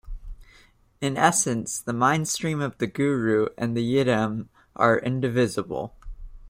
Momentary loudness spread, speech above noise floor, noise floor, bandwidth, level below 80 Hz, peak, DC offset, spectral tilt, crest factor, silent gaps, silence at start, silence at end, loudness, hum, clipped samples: 12 LU; 33 dB; -56 dBFS; 16 kHz; -46 dBFS; -4 dBFS; under 0.1%; -4.5 dB/octave; 22 dB; none; 0.05 s; 0 s; -24 LUFS; none; under 0.1%